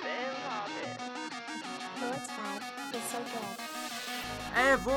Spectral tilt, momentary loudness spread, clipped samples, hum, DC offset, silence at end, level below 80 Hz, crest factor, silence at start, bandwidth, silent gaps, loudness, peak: -3 dB/octave; 10 LU; under 0.1%; none; under 0.1%; 0 s; -58 dBFS; 22 dB; 0 s; 17.5 kHz; none; -35 LUFS; -14 dBFS